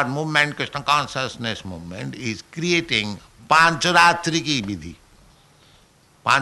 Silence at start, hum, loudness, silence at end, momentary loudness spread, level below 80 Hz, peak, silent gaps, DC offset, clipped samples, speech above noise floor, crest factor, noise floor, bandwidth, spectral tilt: 0 s; none; -20 LUFS; 0 s; 17 LU; -54 dBFS; -4 dBFS; none; under 0.1%; under 0.1%; 34 dB; 18 dB; -55 dBFS; 12 kHz; -3.5 dB/octave